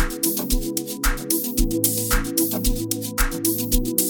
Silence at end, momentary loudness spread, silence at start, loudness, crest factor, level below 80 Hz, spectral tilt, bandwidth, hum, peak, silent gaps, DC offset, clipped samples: 0 s; 5 LU; 0 s; -22 LUFS; 20 dB; -26 dBFS; -3 dB/octave; 19.5 kHz; none; -2 dBFS; none; under 0.1%; under 0.1%